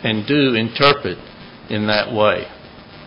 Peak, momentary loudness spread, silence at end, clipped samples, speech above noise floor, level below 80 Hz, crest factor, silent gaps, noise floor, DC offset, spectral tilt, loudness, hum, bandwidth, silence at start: 0 dBFS; 17 LU; 0 s; under 0.1%; 22 dB; -48 dBFS; 18 dB; none; -39 dBFS; under 0.1%; -7.5 dB/octave; -17 LUFS; none; 8 kHz; 0 s